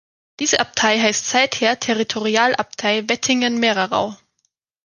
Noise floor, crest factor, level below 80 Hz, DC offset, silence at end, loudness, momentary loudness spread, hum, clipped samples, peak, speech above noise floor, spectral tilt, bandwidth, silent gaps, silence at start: -70 dBFS; 18 dB; -60 dBFS; under 0.1%; 0.7 s; -18 LUFS; 5 LU; none; under 0.1%; 0 dBFS; 52 dB; -2 dB/octave; 10 kHz; none; 0.4 s